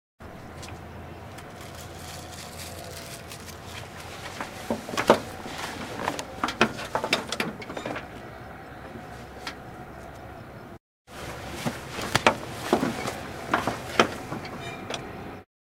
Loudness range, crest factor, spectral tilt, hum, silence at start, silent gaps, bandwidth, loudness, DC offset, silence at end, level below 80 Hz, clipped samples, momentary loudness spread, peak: 12 LU; 32 dB; -4 dB/octave; none; 0.2 s; 10.80-11.05 s; 17.5 kHz; -30 LUFS; under 0.1%; 0.35 s; -54 dBFS; under 0.1%; 18 LU; 0 dBFS